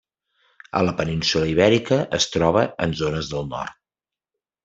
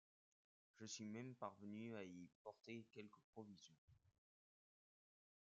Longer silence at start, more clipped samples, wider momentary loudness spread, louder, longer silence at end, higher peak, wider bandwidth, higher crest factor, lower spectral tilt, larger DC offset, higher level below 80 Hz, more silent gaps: about the same, 0.75 s vs 0.75 s; neither; about the same, 10 LU vs 10 LU; first, -21 LUFS vs -57 LUFS; second, 0.95 s vs 1.3 s; first, -2 dBFS vs -36 dBFS; about the same, 8 kHz vs 7.6 kHz; about the same, 20 dB vs 24 dB; about the same, -5 dB/octave vs -5 dB/octave; neither; first, -48 dBFS vs under -90 dBFS; second, none vs 2.35-2.45 s, 3.24-3.33 s, 3.78-3.88 s